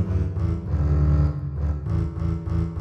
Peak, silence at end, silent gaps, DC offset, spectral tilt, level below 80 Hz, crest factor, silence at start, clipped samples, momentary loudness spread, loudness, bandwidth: -10 dBFS; 0 s; none; under 0.1%; -10 dB/octave; -26 dBFS; 12 dB; 0 s; under 0.1%; 7 LU; -24 LUFS; 5.4 kHz